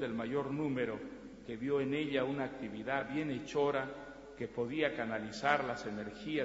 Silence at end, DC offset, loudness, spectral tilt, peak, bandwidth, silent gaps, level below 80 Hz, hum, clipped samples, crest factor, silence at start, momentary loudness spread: 0 s; under 0.1%; -37 LUFS; -4 dB/octave; -14 dBFS; 7.6 kHz; none; -66 dBFS; none; under 0.1%; 22 dB; 0 s; 11 LU